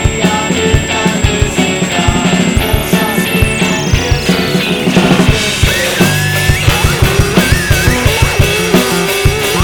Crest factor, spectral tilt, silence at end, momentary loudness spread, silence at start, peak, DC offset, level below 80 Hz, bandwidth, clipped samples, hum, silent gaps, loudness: 10 dB; -4.5 dB/octave; 0 s; 2 LU; 0 s; 0 dBFS; under 0.1%; -20 dBFS; 19.5 kHz; 0.4%; none; none; -11 LUFS